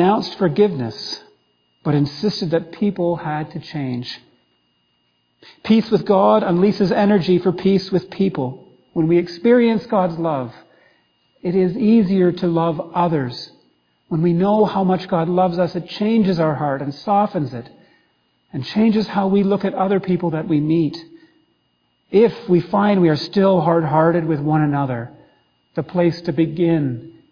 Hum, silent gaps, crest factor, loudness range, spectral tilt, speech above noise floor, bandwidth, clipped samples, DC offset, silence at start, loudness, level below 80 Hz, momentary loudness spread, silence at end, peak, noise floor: none; none; 16 dB; 5 LU; -8.5 dB/octave; 48 dB; 5.2 kHz; under 0.1%; under 0.1%; 0 s; -18 LUFS; -56 dBFS; 12 LU; 0.2 s; -2 dBFS; -65 dBFS